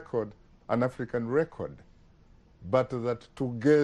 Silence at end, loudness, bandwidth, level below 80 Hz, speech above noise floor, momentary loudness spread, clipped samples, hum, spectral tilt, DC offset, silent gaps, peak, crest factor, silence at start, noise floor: 0 s; -30 LUFS; 10.5 kHz; -58 dBFS; 30 dB; 13 LU; under 0.1%; none; -8 dB/octave; under 0.1%; none; -10 dBFS; 18 dB; 0 s; -58 dBFS